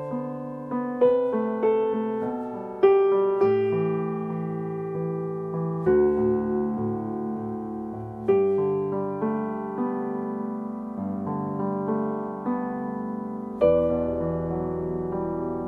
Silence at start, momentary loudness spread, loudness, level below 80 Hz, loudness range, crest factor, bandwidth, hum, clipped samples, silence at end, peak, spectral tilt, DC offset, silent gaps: 0 s; 10 LU; -26 LUFS; -52 dBFS; 6 LU; 18 dB; 3.7 kHz; none; under 0.1%; 0 s; -8 dBFS; -10.5 dB/octave; under 0.1%; none